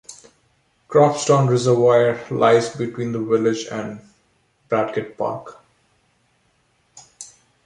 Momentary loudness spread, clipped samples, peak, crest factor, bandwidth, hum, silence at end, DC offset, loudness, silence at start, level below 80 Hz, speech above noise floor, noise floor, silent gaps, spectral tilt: 23 LU; under 0.1%; -2 dBFS; 18 dB; 11 kHz; none; 0.4 s; under 0.1%; -19 LUFS; 0.1 s; -62 dBFS; 45 dB; -63 dBFS; none; -6 dB/octave